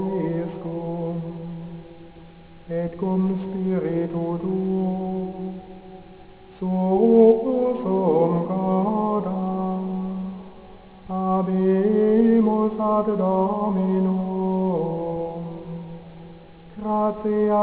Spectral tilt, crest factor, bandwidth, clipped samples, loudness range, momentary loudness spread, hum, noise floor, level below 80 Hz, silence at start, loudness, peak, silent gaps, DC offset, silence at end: -13 dB/octave; 18 dB; 4 kHz; under 0.1%; 7 LU; 17 LU; none; -45 dBFS; -54 dBFS; 0 s; -22 LUFS; -4 dBFS; none; under 0.1%; 0 s